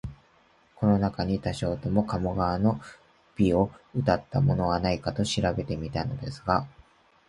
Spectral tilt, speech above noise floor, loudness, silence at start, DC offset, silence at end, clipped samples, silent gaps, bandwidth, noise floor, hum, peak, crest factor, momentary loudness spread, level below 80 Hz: -7 dB/octave; 35 dB; -27 LUFS; 0.05 s; under 0.1%; 0.6 s; under 0.1%; none; 11.5 kHz; -62 dBFS; none; -6 dBFS; 20 dB; 7 LU; -44 dBFS